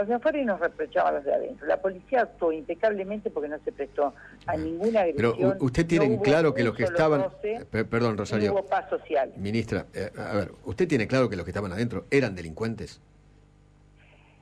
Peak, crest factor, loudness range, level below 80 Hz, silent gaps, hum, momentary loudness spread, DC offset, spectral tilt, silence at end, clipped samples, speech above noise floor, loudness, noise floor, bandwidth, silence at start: -12 dBFS; 16 dB; 4 LU; -52 dBFS; none; 50 Hz at -55 dBFS; 10 LU; under 0.1%; -7 dB/octave; 1.45 s; under 0.1%; 30 dB; -27 LUFS; -56 dBFS; 11 kHz; 0 s